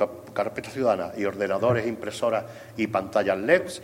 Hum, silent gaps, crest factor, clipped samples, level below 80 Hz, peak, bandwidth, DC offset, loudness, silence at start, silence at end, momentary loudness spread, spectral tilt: none; none; 20 dB; under 0.1%; -62 dBFS; -6 dBFS; 16 kHz; under 0.1%; -26 LUFS; 0 s; 0 s; 8 LU; -5.5 dB/octave